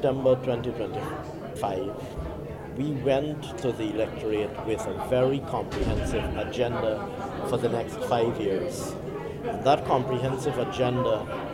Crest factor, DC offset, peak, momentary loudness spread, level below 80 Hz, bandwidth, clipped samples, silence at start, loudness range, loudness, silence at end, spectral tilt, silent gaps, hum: 20 dB; under 0.1%; -8 dBFS; 10 LU; -44 dBFS; 16 kHz; under 0.1%; 0 s; 3 LU; -28 LUFS; 0 s; -6.5 dB/octave; none; none